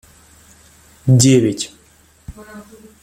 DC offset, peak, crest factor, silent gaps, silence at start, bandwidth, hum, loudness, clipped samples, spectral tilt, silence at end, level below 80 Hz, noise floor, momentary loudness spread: under 0.1%; -2 dBFS; 18 dB; none; 1.05 s; 15.5 kHz; none; -14 LUFS; under 0.1%; -5.5 dB/octave; 0.4 s; -48 dBFS; -51 dBFS; 27 LU